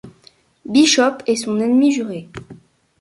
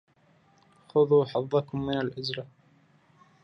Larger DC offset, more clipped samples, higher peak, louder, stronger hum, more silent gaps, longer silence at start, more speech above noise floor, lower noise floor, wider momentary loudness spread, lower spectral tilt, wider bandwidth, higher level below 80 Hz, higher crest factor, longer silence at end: neither; neither; first, -2 dBFS vs -12 dBFS; first, -16 LUFS vs -27 LUFS; neither; neither; second, 0.05 s vs 0.95 s; about the same, 36 dB vs 37 dB; second, -52 dBFS vs -63 dBFS; first, 19 LU vs 13 LU; second, -3 dB/octave vs -7.5 dB/octave; first, 11.5 kHz vs 6.4 kHz; about the same, -58 dBFS vs -62 dBFS; about the same, 16 dB vs 18 dB; second, 0.45 s vs 0.95 s